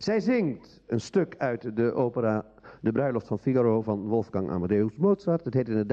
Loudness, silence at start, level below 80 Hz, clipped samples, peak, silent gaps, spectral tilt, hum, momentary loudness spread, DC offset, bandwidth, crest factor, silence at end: -27 LUFS; 0 s; -62 dBFS; under 0.1%; -12 dBFS; none; -8 dB/octave; none; 7 LU; under 0.1%; 8.2 kHz; 16 dB; 0 s